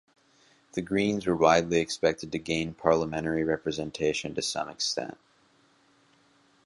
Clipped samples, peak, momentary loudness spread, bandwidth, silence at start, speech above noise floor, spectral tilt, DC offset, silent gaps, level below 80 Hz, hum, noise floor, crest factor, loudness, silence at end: under 0.1%; -6 dBFS; 11 LU; 11.5 kHz; 0.75 s; 37 dB; -4.5 dB/octave; under 0.1%; none; -56 dBFS; none; -64 dBFS; 22 dB; -28 LUFS; 1.5 s